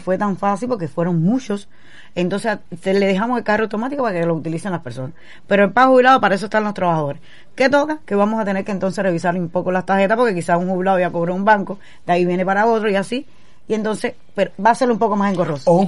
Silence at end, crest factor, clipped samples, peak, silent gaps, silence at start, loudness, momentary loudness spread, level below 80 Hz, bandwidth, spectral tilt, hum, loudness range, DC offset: 0 s; 16 dB; under 0.1%; -2 dBFS; none; 0.05 s; -18 LUFS; 10 LU; -58 dBFS; 11.5 kHz; -6.5 dB/octave; none; 4 LU; 2%